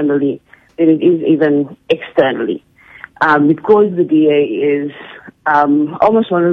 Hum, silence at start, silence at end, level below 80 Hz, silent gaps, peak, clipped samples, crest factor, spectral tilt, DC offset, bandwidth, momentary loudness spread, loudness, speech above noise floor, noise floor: none; 0 s; 0 s; -58 dBFS; none; 0 dBFS; under 0.1%; 12 dB; -8.5 dB/octave; under 0.1%; 5 kHz; 10 LU; -13 LUFS; 25 dB; -38 dBFS